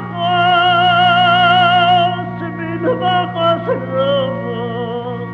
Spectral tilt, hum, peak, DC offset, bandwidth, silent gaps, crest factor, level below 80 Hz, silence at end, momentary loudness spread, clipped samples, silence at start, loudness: -7 dB/octave; 60 Hz at -45 dBFS; -2 dBFS; under 0.1%; 6 kHz; none; 14 dB; -52 dBFS; 0 s; 12 LU; under 0.1%; 0 s; -14 LUFS